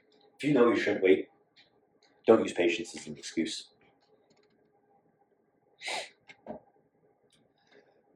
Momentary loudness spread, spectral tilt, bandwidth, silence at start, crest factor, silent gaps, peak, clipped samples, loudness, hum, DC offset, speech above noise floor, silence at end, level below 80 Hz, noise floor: 22 LU; -4.5 dB/octave; 11.5 kHz; 0.4 s; 24 dB; none; -8 dBFS; under 0.1%; -29 LUFS; none; under 0.1%; 43 dB; 1.6 s; -80 dBFS; -70 dBFS